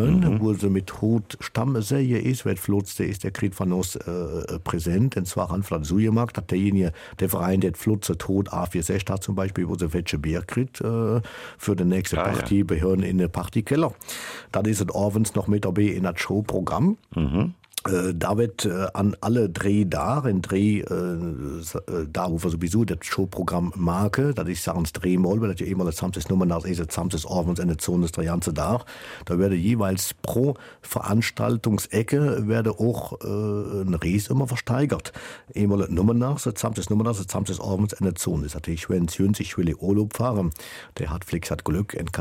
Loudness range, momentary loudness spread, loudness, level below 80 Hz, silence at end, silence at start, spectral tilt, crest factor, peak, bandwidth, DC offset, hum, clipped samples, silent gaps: 2 LU; 7 LU; -25 LUFS; -42 dBFS; 0 s; 0 s; -6.5 dB/octave; 18 dB; -6 dBFS; 16.5 kHz; under 0.1%; none; under 0.1%; none